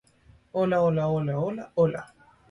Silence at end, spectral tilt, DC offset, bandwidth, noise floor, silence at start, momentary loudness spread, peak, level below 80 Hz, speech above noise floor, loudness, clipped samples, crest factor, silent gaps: 0.45 s; -9 dB/octave; under 0.1%; 11 kHz; -58 dBFS; 0.55 s; 8 LU; -12 dBFS; -60 dBFS; 33 dB; -26 LUFS; under 0.1%; 16 dB; none